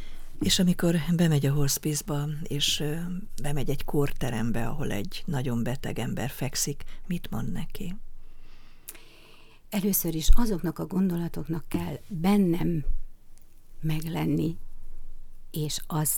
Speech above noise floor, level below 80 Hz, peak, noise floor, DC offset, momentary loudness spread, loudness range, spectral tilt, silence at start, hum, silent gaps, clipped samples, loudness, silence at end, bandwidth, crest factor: 24 dB; -32 dBFS; -4 dBFS; -49 dBFS; under 0.1%; 14 LU; 7 LU; -5 dB/octave; 0 s; none; none; under 0.1%; -28 LUFS; 0 s; 18.5 kHz; 22 dB